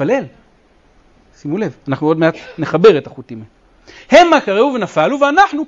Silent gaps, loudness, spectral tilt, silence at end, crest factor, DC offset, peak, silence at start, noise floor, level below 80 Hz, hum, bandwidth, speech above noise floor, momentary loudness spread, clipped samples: none; -13 LUFS; -5.5 dB/octave; 0 s; 14 dB; under 0.1%; 0 dBFS; 0 s; -51 dBFS; -50 dBFS; none; 7.8 kHz; 38 dB; 22 LU; under 0.1%